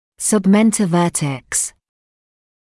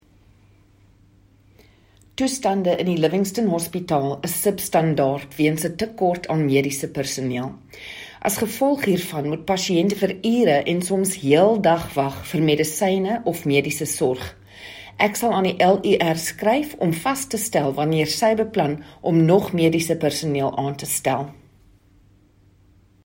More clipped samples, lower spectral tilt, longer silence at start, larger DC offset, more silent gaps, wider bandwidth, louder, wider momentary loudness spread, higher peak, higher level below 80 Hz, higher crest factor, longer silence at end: neither; about the same, -5 dB/octave vs -5 dB/octave; second, 0.2 s vs 2.2 s; neither; neither; second, 12 kHz vs 16.5 kHz; first, -16 LUFS vs -21 LUFS; about the same, 7 LU vs 8 LU; about the same, -4 dBFS vs -2 dBFS; about the same, -54 dBFS vs -56 dBFS; second, 14 dB vs 20 dB; second, 1 s vs 1.75 s